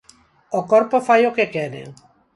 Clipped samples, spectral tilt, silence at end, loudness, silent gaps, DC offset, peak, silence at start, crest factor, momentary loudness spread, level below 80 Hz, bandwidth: under 0.1%; -5.5 dB/octave; 0.45 s; -18 LUFS; none; under 0.1%; -2 dBFS; 0.5 s; 18 dB; 13 LU; -66 dBFS; 11.5 kHz